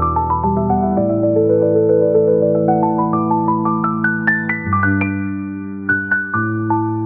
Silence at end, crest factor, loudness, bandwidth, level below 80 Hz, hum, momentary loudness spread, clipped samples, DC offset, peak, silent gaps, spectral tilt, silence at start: 0 s; 12 dB; -16 LUFS; 3.4 kHz; -44 dBFS; none; 5 LU; under 0.1%; 0.2%; -2 dBFS; none; -9 dB/octave; 0 s